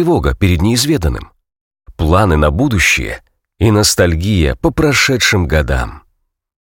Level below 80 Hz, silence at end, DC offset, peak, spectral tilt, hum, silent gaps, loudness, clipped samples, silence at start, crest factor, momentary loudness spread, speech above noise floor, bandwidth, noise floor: -24 dBFS; 0.65 s; under 0.1%; 0 dBFS; -4.5 dB/octave; none; 1.61-1.71 s; -13 LUFS; under 0.1%; 0 s; 14 dB; 9 LU; 50 dB; 17 kHz; -63 dBFS